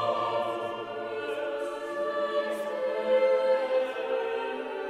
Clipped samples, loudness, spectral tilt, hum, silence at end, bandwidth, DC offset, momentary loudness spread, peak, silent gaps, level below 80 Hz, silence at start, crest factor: under 0.1%; -29 LUFS; -4.5 dB/octave; none; 0 s; 12.5 kHz; under 0.1%; 9 LU; -16 dBFS; none; -72 dBFS; 0 s; 14 dB